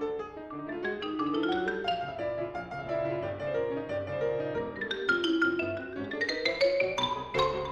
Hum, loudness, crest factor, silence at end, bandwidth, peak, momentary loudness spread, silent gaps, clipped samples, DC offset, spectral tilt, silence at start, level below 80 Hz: none; -31 LUFS; 16 dB; 0 s; 10.5 kHz; -14 dBFS; 9 LU; none; under 0.1%; under 0.1%; -5 dB/octave; 0 s; -58 dBFS